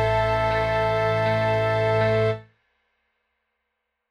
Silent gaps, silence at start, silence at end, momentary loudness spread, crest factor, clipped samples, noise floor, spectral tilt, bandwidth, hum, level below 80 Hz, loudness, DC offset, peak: none; 0 s; 1.7 s; 2 LU; 14 dB; under 0.1%; -79 dBFS; -7 dB/octave; 9.4 kHz; none; -42 dBFS; -22 LUFS; under 0.1%; -10 dBFS